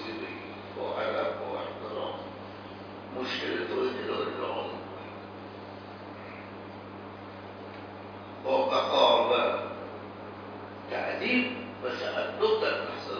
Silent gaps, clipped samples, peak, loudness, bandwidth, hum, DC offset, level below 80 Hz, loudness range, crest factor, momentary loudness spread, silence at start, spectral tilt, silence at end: none; under 0.1%; -10 dBFS; -30 LUFS; 5.4 kHz; none; under 0.1%; -70 dBFS; 12 LU; 22 dB; 17 LU; 0 s; -5 dB/octave; 0 s